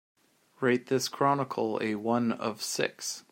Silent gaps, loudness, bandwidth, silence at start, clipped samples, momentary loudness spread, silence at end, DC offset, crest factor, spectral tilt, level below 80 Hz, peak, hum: none; -30 LUFS; 16 kHz; 0.6 s; under 0.1%; 5 LU; 0.1 s; under 0.1%; 20 dB; -4 dB/octave; -76 dBFS; -10 dBFS; none